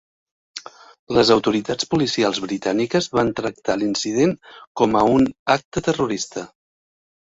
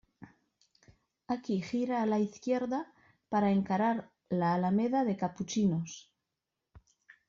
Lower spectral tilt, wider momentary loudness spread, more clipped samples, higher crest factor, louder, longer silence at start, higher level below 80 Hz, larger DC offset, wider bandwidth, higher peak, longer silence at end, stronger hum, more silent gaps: second, -4.5 dB/octave vs -6.5 dB/octave; first, 18 LU vs 9 LU; neither; first, 20 dB vs 14 dB; first, -20 LUFS vs -32 LUFS; first, 0.55 s vs 0.2 s; first, -52 dBFS vs -70 dBFS; neither; about the same, 8 kHz vs 7.4 kHz; first, -2 dBFS vs -18 dBFS; first, 0.9 s vs 0.5 s; neither; first, 0.99-1.07 s, 4.67-4.75 s, 5.39-5.46 s, 5.65-5.71 s vs none